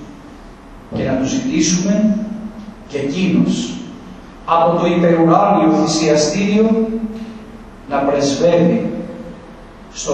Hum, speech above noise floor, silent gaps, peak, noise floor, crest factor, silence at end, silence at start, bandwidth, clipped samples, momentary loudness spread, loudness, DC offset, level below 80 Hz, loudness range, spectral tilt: none; 23 dB; none; 0 dBFS; -37 dBFS; 16 dB; 0 s; 0 s; 8.8 kHz; under 0.1%; 20 LU; -15 LUFS; under 0.1%; -42 dBFS; 5 LU; -5.5 dB/octave